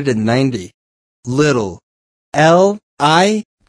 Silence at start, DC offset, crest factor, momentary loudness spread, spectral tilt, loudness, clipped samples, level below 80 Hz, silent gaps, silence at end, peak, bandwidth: 0 s; under 0.1%; 14 dB; 13 LU; -5.5 dB/octave; -14 LUFS; under 0.1%; -54 dBFS; 0.74-1.23 s, 1.83-2.32 s, 2.83-2.97 s; 0.25 s; 0 dBFS; 10.5 kHz